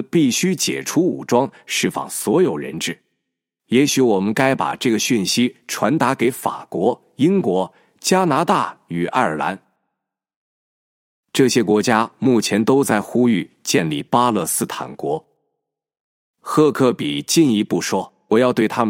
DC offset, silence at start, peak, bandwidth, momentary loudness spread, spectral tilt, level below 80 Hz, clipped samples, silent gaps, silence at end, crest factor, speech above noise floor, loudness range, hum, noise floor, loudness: under 0.1%; 0 s; 0 dBFS; 16.5 kHz; 9 LU; -4.5 dB/octave; -64 dBFS; under 0.1%; 10.36-11.23 s, 16.00-16.34 s; 0 s; 18 dB; 62 dB; 4 LU; none; -80 dBFS; -18 LUFS